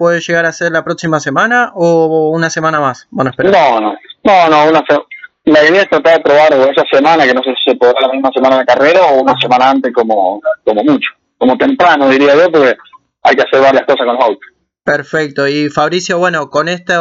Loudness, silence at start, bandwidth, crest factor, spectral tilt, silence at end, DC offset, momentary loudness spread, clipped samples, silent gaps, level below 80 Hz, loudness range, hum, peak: -10 LUFS; 0 s; 7.8 kHz; 10 dB; -5 dB/octave; 0 s; under 0.1%; 8 LU; under 0.1%; none; -54 dBFS; 3 LU; none; 0 dBFS